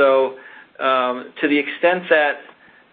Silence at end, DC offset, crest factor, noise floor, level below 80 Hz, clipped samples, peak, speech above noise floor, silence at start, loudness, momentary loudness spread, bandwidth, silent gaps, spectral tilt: 0.5 s; under 0.1%; 16 dB; -39 dBFS; -68 dBFS; under 0.1%; -2 dBFS; 21 dB; 0 s; -19 LUFS; 9 LU; 4.6 kHz; none; -9 dB/octave